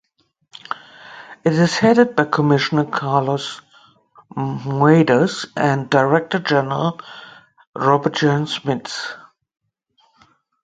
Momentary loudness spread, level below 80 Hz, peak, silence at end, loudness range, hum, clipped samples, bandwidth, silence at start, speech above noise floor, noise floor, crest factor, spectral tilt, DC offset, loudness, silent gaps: 21 LU; -60 dBFS; 0 dBFS; 1.45 s; 5 LU; none; under 0.1%; 9.2 kHz; 0.7 s; 45 dB; -62 dBFS; 20 dB; -6 dB/octave; under 0.1%; -18 LUFS; 7.67-7.73 s